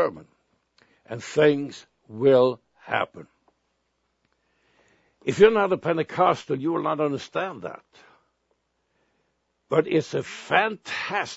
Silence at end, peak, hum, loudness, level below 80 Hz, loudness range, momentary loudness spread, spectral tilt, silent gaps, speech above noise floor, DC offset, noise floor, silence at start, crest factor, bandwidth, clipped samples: 0 s; -2 dBFS; none; -23 LUFS; -66 dBFS; 7 LU; 18 LU; -5.5 dB/octave; none; 51 dB; under 0.1%; -74 dBFS; 0 s; 24 dB; 8 kHz; under 0.1%